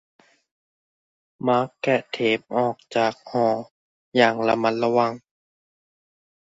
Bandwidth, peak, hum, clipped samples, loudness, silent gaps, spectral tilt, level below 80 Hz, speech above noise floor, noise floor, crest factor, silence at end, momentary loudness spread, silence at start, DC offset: 8 kHz; -2 dBFS; none; under 0.1%; -23 LUFS; 3.71-4.12 s; -6 dB/octave; -70 dBFS; over 68 dB; under -90 dBFS; 22 dB; 1.3 s; 7 LU; 1.4 s; under 0.1%